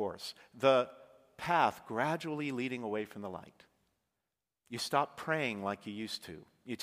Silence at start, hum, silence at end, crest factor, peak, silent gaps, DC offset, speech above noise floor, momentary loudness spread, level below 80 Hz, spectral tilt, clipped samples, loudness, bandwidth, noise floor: 0 s; none; 0 s; 24 dB; -12 dBFS; none; under 0.1%; 54 dB; 16 LU; -76 dBFS; -4.5 dB/octave; under 0.1%; -35 LUFS; 15.5 kHz; -89 dBFS